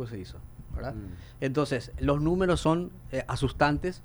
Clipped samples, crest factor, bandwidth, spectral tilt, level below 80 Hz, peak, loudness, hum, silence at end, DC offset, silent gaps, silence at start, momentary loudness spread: under 0.1%; 18 dB; over 20 kHz; -6.5 dB/octave; -42 dBFS; -10 dBFS; -29 LUFS; none; 0 s; under 0.1%; none; 0 s; 16 LU